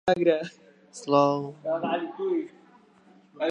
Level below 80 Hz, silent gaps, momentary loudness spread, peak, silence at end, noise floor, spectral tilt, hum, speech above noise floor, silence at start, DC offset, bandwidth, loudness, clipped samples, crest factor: -70 dBFS; none; 18 LU; -8 dBFS; 0 s; -57 dBFS; -6 dB/octave; none; 32 dB; 0.05 s; under 0.1%; 10.5 kHz; -26 LUFS; under 0.1%; 20 dB